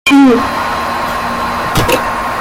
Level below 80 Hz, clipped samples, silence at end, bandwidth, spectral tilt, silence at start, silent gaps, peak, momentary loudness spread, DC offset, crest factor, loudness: -32 dBFS; under 0.1%; 0 s; 16.5 kHz; -4.5 dB/octave; 0.05 s; none; 0 dBFS; 9 LU; under 0.1%; 12 dB; -12 LUFS